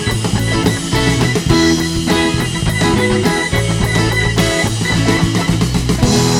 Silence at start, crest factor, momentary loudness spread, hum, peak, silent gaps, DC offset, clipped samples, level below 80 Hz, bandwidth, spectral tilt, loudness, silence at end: 0 s; 14 dB; 3 LU; none; 0 dBFS; none; under 0.1%; under 0.1%; -26 dBFS; 17 kHz; -4.5 dB/octave; -14 LUFS; 0 s